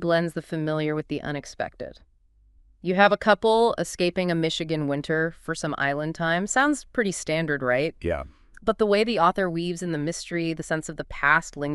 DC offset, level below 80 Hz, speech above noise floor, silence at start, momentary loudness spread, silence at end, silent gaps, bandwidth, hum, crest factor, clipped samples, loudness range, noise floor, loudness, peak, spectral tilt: under 0.1%; -50 dBFS; 35 dB; 0 s; 11 LU; 0 s; none; 12.5 kHz; none; 20 dB; under 0.1%; 2 LU; -59 dBFS; -25 LUFS; -4 dBFS; -5 dB/octave